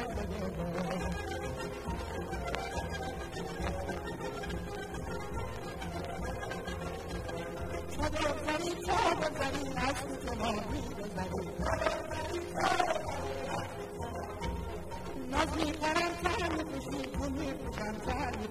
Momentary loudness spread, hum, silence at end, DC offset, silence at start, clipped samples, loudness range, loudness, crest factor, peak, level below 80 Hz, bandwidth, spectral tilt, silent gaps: 9 LU; none; 0 s; under 0.1%; 0 s; under 0.1%; 5 LU; -36 LUFS; 22 dB; -14 dBFS; -46 dBFS; 16 kHz; -5 dB/octave; none